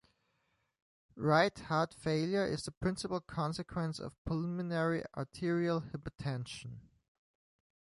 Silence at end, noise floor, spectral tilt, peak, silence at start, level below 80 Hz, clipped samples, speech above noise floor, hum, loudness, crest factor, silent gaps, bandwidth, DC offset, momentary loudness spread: 1 s; -79 dBFS; -6 dB/octave; -14 dBFS; 1.15 s; -60 dBFS; under 0.1%; 44 dB; none; -36 LUFS; 22 dB; 2.77-2.81 s, 4.18-4.25 s; 11.5 kHz; under 0.1%; 13 LU